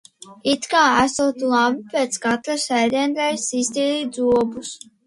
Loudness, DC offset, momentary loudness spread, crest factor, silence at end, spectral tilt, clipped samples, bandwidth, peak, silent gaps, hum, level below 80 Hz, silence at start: -20 LUFS; under 0.1%; 7 LU; 16 dB; 0.3 s; -2.5 dB/octave; under 0.1%; 11.5 kHz; -4 dBFS; none; none; -56 dBFS; 0.25 s